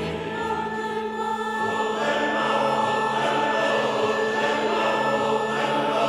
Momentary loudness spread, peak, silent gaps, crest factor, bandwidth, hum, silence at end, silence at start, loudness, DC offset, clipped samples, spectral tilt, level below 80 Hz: 6 LU; -10 dBFS; none; 14 dB; 15 kHz; none; 0 s; 0 s; -23 LUFS; under 0.1%; under 0.1%; -4 dB/octave; -58 dBFS